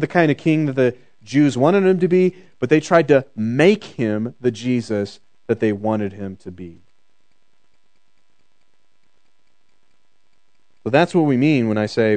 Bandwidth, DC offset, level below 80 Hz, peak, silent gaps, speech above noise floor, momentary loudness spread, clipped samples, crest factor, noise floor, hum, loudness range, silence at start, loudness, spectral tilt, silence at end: 9.2 kHz; 0.4%; -66 dBFS; 0 dBFS; none; 51 dB; 15 LU; under 0.1%; 20 dB; -69 dBFS; none; 11 LU; 0 s; -18 LUFS; -7 dB/octave; 0 s